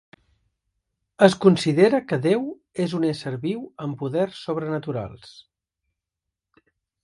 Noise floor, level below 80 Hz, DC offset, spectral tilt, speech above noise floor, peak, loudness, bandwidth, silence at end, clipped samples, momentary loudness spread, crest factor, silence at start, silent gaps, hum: -85 dBFS; -62 dBFS; under 0.1%; -6.5 dB/octave; 64 dB; 0 dBFS; -22 LUFS; 11.5 kHz; 1.75 s; under 0.1%; 13 LU; 24 dB; 1.2 s; none; none